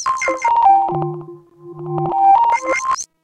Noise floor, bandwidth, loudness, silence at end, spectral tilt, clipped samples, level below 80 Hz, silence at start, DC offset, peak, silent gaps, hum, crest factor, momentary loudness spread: -37 dBFS; 10 kHz; -16 LUFS; 0.2 s; -4.5 dB/octave; under 0.1%; -54 dBFS; 0 s; under 0.1%; -4 dBFS; none; none; 14 dB; 14 LU